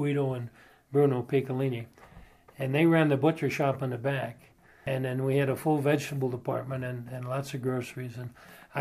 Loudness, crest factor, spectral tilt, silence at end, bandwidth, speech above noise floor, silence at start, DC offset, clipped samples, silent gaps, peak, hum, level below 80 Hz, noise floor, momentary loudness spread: -29 LUFS; 18 dB; -7.5 dB/octave; 0 s; 15.5 kHz; 25 dB; 0 s; under 0.1%; under 0.1%; none; -10 dBFS; none; -66 dBFS; -53 dBFS; 14 LU